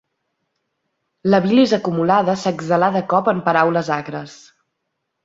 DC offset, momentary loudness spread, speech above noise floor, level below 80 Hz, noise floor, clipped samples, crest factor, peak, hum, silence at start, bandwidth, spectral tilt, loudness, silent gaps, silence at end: under 0.1%; 10 LU; 59 dB; -60 dBFS; -75 dBFS; under 0.1%; 18 dB; 0 dBFS; none; 1.25 s; 7.8 kHz; -6.5 dB/octave; -17 LUFS; none; 0.9 s